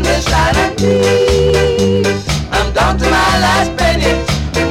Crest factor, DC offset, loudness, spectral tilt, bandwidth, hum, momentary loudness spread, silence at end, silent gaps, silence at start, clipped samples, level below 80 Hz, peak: 12 dB; under 0.1%; -12 LUFS; -4.5 dB/octave; 16 kHz; none; 4 LU; 0 s; none; 0 s; under 0.1%; -22 dBFS; 0 dBFS